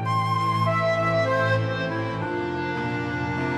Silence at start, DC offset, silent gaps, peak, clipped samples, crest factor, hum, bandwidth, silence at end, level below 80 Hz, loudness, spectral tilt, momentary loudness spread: 0 s; under 0.1%; none; -10 dBFS; under 0.1%; 14 dB; none; 12 kHz; 0 s; -54 dBFS; -24 LUFS; -7 dB/octave; 6 LU